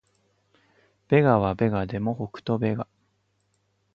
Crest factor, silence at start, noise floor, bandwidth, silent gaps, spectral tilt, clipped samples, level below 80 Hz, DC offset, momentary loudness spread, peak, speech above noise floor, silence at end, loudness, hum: 22 dB; 1.1 s; -71 dBFS; 6.8 kHz; none; -10 dB/octave; under 0.1%; -52 dBFS; under 0.1%; 13 LU; -6 dBFS; 47 dB; 1.1 s; -24 LUFS; 50 Hz at -50 dBFS